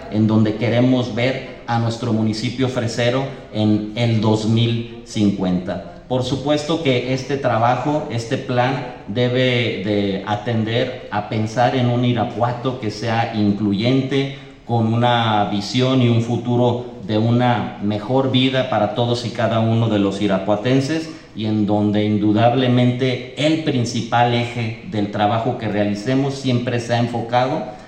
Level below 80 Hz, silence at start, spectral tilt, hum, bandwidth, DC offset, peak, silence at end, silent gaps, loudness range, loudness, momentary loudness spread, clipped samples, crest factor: -50 dBFS; 0 s; -6.5 dB/octave; none; 9 kHz; under 0.1%; -2 dBFS; 0 s; none; 2 LU; -19 LUFS; 7 LU; under 0.1%; 16 dB